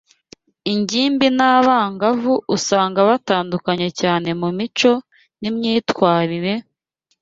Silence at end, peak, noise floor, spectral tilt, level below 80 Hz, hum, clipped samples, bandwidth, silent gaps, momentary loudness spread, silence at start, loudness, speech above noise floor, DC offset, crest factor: 0.6 s; -2 dBFS; -69 dBFS; -4.5 dB/octave; -60 dBFS; none; under 0.1%; 8 kHz; none; 9 LU; 0.65 s; -18 LUFS; 52 dB; under 0.1%; 16 dB